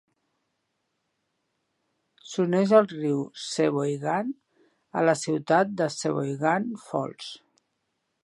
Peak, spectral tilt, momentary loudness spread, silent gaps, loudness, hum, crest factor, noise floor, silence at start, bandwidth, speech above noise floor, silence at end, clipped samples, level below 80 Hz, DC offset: -4 dBFS; -5.5 dB/octave; 15 LU; none; -26 LUFS; none; 24 dB; -78 dBFS; 2.25 s; 11.5 kHz; 53 dB; 0.9 s; under 0.1%; -78 dBFS; under 0.1%